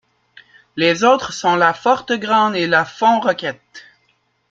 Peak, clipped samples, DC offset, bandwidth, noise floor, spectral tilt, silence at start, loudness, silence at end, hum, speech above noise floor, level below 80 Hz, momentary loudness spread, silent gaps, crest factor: 0 dBFS; under 0.1%; under 0.1%; 7.8 kHz; -63 dBFS; -4 dB/octave; 0.75 s; -16 LUFS; 0.7 s; none; 47 dB; -62 dBFS; 9 LU; none; 16 dB